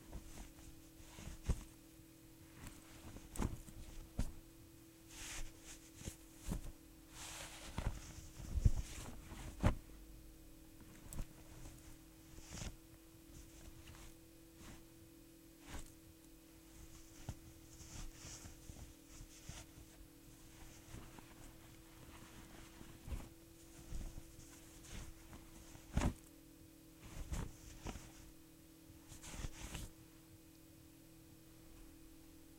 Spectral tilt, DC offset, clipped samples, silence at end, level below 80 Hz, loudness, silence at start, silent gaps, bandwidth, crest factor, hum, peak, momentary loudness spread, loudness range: -5 dB/octave; under 0.1%; under 0.1%; 0 s; -52 dBFS; -51 LUFS; 0 s; none; 16 kHz; 30 dB; none; -18 dBFS; 15 LU; 13 LU